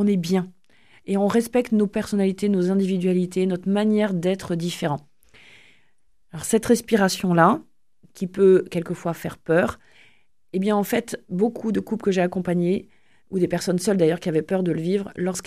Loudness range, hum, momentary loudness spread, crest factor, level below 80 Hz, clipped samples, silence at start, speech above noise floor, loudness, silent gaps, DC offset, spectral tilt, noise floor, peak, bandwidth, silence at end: 4 LU; none; 10 LU; 20 dB; -58 dBFS; under 0.1%; 0 s; 48 dB; -22 LUFS; none; 0.2%; -6 dB/octave; -69 dBFS; -2 dBFS; 14.5 kHz; 0.05 s